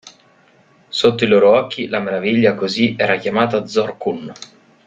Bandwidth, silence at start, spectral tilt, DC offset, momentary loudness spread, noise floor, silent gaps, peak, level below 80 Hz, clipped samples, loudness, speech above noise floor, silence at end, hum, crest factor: 9 kHz; 0.05 s; -5.5 dB/octave; under 0.1%; 12 LU; -52 dBFS; none; -2 dBFS; -58 dBFS; under 0.1%; -16 LUFS; 36 dB; 0.4 s; none; 16 dB